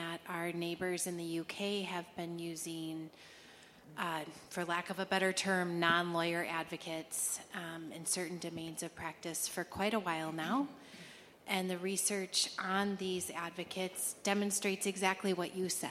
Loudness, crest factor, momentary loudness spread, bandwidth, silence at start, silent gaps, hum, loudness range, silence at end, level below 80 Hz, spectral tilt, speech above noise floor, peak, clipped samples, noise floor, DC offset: -37 LUFS; 22 dB; 11 LU; 16.5 kHz; 0 s; none; none; 6 LU; 0 s; -76 dBFS; -3 dB/octave; 21 dB; -14 dBFS; under 0.1%; -58 dBFS; under 0.1%